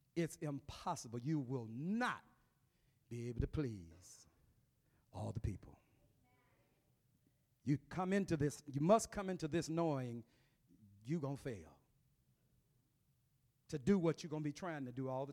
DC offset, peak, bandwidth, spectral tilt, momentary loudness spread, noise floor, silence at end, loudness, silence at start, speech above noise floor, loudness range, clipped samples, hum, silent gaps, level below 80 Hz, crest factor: under 0.1%; -18 dBFS; 15.5 kHz; -6.5 dB/octave; 16 LU; -79 dBFS; 0 s; -41 LUFS; 0.15 s; 38 dB; 12 LU; under 0.1%; none; none; -62 dBFS; 24 dB